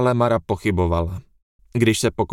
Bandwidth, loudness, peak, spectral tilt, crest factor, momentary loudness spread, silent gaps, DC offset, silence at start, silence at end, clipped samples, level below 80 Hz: 16.5 kHz; -21 LUFS; -2 dBFS; -6 dB/octave; 18 dB; 11 LU; 1.42-1.59 s; under 0.1%; 0 s; 0 s; under 0.1%; -38 dBFS